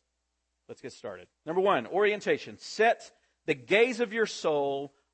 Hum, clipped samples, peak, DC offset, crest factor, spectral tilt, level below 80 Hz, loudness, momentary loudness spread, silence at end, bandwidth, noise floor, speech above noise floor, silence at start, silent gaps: none; under 0.1%; -10 dBFS; under 0.1%; 18 dB; -4 dB/octave; -78 dBFS; -28 LUFS; 18 LU; 0.25 s; 8.8 kHz; -80 dBFS; 52 dB; 0.7 s; none